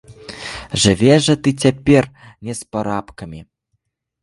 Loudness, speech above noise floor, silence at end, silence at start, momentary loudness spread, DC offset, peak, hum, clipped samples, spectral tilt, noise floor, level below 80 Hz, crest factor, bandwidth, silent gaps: -16 LUFS; 55 dB; 0.8 s; 0.1 s; 21 LU; under 0.1%; 0 dBFS; none; under 0.1%; -5 dB/octave; -71 dBFS; -42 dBFS; 18 dB; 11.5 kHz; none